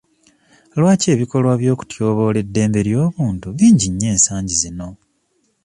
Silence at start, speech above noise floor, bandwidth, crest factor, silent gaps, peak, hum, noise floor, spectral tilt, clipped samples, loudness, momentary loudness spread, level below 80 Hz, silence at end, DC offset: 0.75 s; 49 dB; 11.5 kHz; 16 dB; none; 0 dBFS; none; -64 dBFS; -5.5 dB/octave; under 0.1%; -16 LUFS; 9 LU; -42 dBFS; 0.7 s; under 0.1%